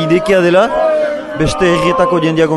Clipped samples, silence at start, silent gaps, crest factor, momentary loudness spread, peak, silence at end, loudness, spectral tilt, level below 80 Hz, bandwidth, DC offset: under 0.1%; 0 s; none; 12 dB; 6 LU; 0 dBFS; 0 s; -12 LUFS; -6 dB/octave; -36 dBFS; 12 kHz; under 0.1%